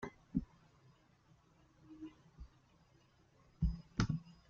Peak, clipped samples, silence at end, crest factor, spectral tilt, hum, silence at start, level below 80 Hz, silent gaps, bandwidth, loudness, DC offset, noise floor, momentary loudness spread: -20 dBFS; under 0.1%; 0.15 s; 24 dB; -7 dB/octave; none; 0 s; -52 dBFS; none; 7.6 kHz; -42 LUFS; under 0.1%; -70 dBFS; 22 LU